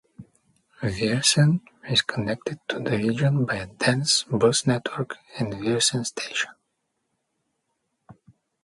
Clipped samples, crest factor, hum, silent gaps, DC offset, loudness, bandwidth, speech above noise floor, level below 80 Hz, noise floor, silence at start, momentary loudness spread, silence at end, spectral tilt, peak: under 0.1%; 20 dB; none; none; under 0.1%; -24 LUFS; 11.5 kHz; 53 dB; -56 dBFS; -77 dBFS; 0.2 s; 11 LU; 0.5 s; -4 dB/octave; -6 dBFS